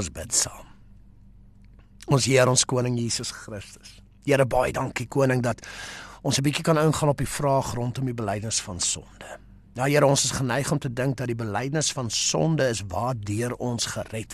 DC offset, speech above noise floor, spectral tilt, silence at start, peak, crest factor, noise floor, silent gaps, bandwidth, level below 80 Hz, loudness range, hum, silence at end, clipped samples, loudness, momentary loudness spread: under 0.1%; 26 dB; -4 dB/octave; 0 s; -6 dBFS; 20 dB; -50 dBFS; none; 13 kHz; -48 dBFS; 2 LU; none; 0 s; under 0.1%; -24 LUFS; 15 LU